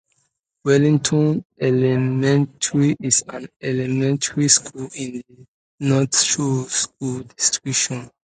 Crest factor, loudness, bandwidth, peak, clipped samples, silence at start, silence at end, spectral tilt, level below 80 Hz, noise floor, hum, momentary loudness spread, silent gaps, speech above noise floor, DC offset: 20 dB; -19 LUFS; 9.6 kHz; 0 dBFS; under 0.1%; 0.65 s; 0.2 s; -4 dB/octave; -60 dBFS; -70 dBFS; none; 13 LU; 1.45-1.50 s, 3.56-3.60 s, 5.48-5.78 s; 50 dB; under 0.1%